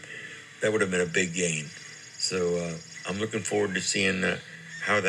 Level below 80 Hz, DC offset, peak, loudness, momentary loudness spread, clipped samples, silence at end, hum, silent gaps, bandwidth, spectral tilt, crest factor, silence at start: -66 dBFS; under 0.1%; -10 dBFS; -28 LUFS; 15 LU; under 0.1%; 0 s; none; none; 13 kHz; -3.5 dB/octave; 18 dB; 0 s